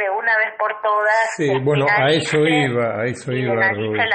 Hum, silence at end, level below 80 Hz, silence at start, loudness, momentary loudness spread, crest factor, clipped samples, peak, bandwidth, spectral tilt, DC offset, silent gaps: none; 0 s; -58 dBFS; 0 s; -18 LUFS; 6 LU; 14 dB; under 0.1%; -4 dBFS; 8.8 kHz; -5 dB/octave; under 0.1%; none